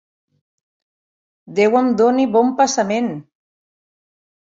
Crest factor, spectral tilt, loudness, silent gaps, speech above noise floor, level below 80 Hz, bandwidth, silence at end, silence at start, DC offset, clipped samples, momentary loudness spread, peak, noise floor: 16 dB; -4.5 dB/octave; -16 LUFS; none; over 74 dB; -66 dBFS; 7.8 kHz; 1.35 s; 1.5 s; under 0.1%; under 0.1%; 11 LU; -2 dBFS; under -90 dBFS